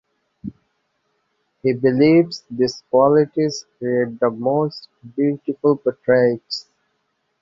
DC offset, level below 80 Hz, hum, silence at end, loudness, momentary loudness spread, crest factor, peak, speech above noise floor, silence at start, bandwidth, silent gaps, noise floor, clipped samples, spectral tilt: under 0.1%; -60 dBFS; none; 0.8 s; -19 LUFS; 16 LU; 18 dB; -2 dBFS; 52 dB; 0.45 s; 7.6 kHz; none; -70 dBFS; under 0.1%; -6.5 dB/octave